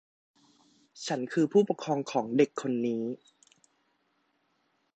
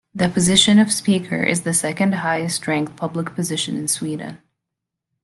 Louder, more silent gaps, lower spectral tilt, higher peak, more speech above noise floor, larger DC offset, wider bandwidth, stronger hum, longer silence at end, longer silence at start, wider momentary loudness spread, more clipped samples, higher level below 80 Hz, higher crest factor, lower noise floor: second, -29 LUFS vs -18 LUFS; neither; first, -6 dB/octave vs -3.5 dB/octave; second, -12 dBFS vs -2 dBFS; second, 46 dB vs 63 dB; neither; second, 8.8 kHz vs 12.5 kHz; neither; first, 1.8 s vs 0.85 s; first, 0.95 s vs 0.15 s; about the same, 11 LU vs 11 LU; neither; second, -80 dBFS vs -54 dBFS; about the same, 20 dB vs 18 dB; second, -74 dBFS vs -82 dBFS